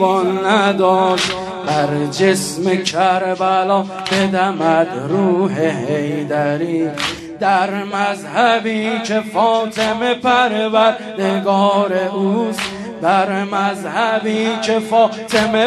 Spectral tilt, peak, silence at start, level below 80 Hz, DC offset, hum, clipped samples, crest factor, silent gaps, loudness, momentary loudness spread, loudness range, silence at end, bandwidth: -4.5 dB/octave; 0 dBFS; 0 s; -56 dBFS; under 0.1%; none; under 0.1%; 16 dB; none; -16 LUFS; 5 LU; 2 LU; 0 s; 13 kHz